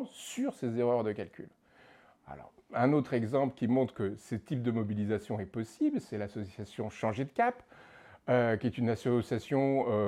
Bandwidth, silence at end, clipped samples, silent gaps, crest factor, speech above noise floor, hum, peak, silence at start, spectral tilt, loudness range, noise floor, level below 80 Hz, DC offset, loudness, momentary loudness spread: 14 kHz; 0 s; under 0.1%; none; 18 dB; 29 dB; none; -14 dBFS; 0 s; -7.5 dB/octave; 3 LU; -61 dBFS; -68 dBFS; under 0.1%; -33 LUFS; 14 LU